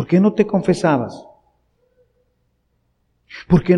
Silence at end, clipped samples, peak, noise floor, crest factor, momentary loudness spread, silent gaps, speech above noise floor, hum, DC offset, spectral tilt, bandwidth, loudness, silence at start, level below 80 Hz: 0 s; under 0.1%; -2 dBFS; -66 dBFS; 18 dB; 23 LU; none; 50 dB; none; under 0.1%; -8 dB/octave; 10.5 kHz; -17 LUFS; 0 s; -44 dBFS